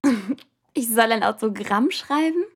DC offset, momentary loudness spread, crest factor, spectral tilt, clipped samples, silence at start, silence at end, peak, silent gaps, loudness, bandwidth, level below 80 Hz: under 0.1%; 12 LU; 18 dB; -3.5 dB/octave; under 0.1%; 0.05 s; 0.1 s; -4 dBFS; none; -22 LUFS; 17.5 kHz; -68 dBFS